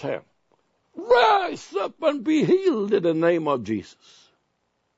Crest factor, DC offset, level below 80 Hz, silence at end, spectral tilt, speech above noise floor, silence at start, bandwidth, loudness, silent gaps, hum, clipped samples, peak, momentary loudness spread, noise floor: 16 dB; under 0.1%; -64 dBFS; 1.15 s; -6 dB/octave; 51 dB; 0 s; 8 kHz; -22 LUFS; none; none; under 0.1%; -6 dBFS; 13 LU; -73 dBFS